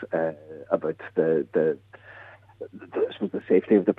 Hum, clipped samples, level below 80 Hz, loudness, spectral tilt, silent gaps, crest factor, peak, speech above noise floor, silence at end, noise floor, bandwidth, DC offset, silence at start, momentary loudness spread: none; under 0.1%; -72 dBFS; -26 LUFS; -9.5 dB/octave; none; 20 dB; -6 dBFS; 23 dB; 0.05 s; -48 dBFS; 4 kHz; under 0.1%; 0 s; 22 LU